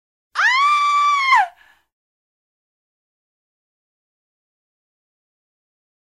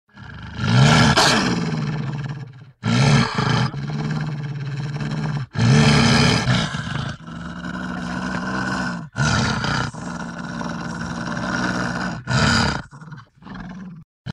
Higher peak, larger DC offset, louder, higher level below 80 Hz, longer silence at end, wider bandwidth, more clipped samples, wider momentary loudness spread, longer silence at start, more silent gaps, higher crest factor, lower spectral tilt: about the same, -4 dBFS vs -2 dBFS; neither; first, -15 LUFS vs -20 LUFS; second, -76 dBFS vs -40 dBFS; first, 4.6 s vs 0 s; about the same, 12 kHz vs 12.5 kHz; neither; second, 9 LU vs 20 LU; first, 0.35 s vs 0.15 s; second, none vs 14.04-14.25 s; about the same, 18 dB vs 18 dB; second, 4 dB/octave vs -5 dB/octave